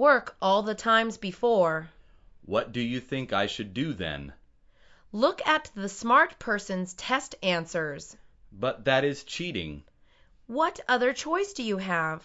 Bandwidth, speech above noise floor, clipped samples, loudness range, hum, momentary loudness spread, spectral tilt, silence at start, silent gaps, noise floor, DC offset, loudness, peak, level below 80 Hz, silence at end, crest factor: 8 kHz; 32 dB; under 0.1%; 4 LU; none; 11 LU; -4.5 dB/octave; 0 s; none; -59 dBFS; under 0.1%; -27 LUFS; -8 dBFS; -58 dBFS; 0.05 s; 20 dB